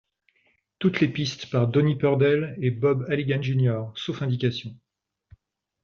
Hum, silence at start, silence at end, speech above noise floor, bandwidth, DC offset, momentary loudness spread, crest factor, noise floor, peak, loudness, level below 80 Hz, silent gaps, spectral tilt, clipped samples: none; 0.8 s; 1.1 s; 45 dB; 6.8 kHz; under 0.1%; 8 LU; 18 dB; -68 dBFS; -6 dBFS; -24 LUFS; -62 dBFS; none; -6.5 dB/octave; under 0.1%